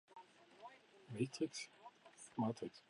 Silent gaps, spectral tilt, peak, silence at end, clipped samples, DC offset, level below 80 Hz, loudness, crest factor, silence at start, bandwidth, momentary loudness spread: none; -5.5 dB/octave; -28 dBFS; 0.1 s; under 0.1%; under 0.1%; -88 dBFS; -45 LUFS; 20 dB; 0.15 s; 11 kHz; 20 LU